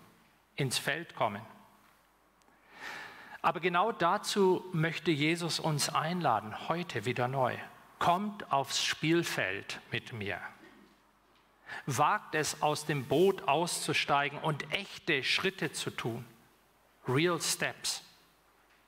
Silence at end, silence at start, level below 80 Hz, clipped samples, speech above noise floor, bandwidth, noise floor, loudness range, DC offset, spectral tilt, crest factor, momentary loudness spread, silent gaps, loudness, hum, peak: 0.8 s; 0.55 s; -72 dBFS; under 0.1%; 35 dB; 16 kHz; -67 dBFS; 5 LU; under 0.1%; -4 dB/octave; 20 dB; 12 LU; none; -32 LUFS; none; -14 dBFS